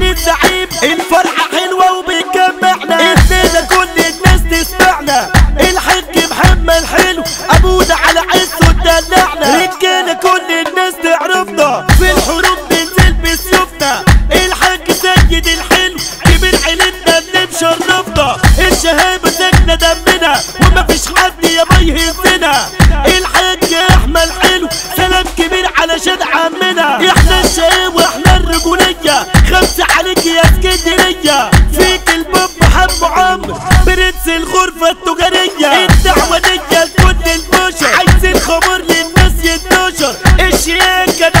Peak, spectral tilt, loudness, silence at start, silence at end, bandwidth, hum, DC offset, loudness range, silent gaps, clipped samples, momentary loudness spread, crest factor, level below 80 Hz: 0 dBFS; -3.5 dB/octave; -9 LUFS; 0 s; 0 s; 16.5 kHz; none; under 0.1%; 1 LU; none; 0.9%; 4 LU; 10 dB; -16 dBFS